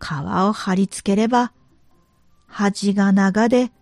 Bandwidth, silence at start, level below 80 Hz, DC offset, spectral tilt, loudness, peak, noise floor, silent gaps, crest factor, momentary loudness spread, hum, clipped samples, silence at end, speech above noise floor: 11.5 kHz; 0 s; -54 dBFS; under 0.1%; -6 dB/octave; -19 LUFS; -4 dBFS; -56 dBFS; none; 16 dB; 7 LU; none; under 0.1%; 0.15 s; 38 dB